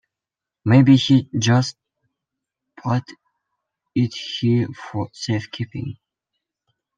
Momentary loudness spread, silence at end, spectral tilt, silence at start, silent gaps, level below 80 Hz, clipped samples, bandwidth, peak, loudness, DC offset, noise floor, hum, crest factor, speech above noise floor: 15 LU; 1.05 s; -6 dB/octave; 0.65 s; none; -58 dBFS; under 0.1%; 7.6 kHz; -4 dBFS; -20 LUFS; under 0.1%; -87 dBFS; none; 18 dB; 69 dB